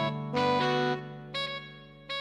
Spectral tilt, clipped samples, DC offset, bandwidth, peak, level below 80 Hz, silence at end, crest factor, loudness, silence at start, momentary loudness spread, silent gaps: -5.5 dB/octave; under 0.1%; under 0.1%; 10.5 kHz; -14 dBFS; -64 dBFS; 0 s; 18 dB; -30 LUFS; 0 s; 15 LU; none